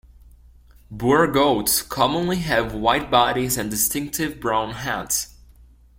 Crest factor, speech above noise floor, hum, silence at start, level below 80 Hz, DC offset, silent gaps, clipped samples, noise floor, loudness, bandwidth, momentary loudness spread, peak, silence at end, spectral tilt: 20 dB; 29 dB; none; 0.9 s; -44 dBFS; under 0.1%; none; under 0.1%; -50 dBFS; -21 LUFS; 16.5 kHz; 8 LU; -2 dBFS; 0.7 s; -3.5 dB/octave